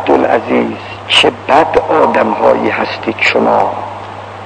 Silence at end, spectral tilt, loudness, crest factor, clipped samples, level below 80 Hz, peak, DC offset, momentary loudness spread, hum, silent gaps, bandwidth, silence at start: 0 s; -4.5 dB/octave; -11 LUFS; 12 dB; 0.7%; -46 dBFS; 0 dBFS; under 0.1%; 14 LU; none; none; 9.4 kHz; 0 s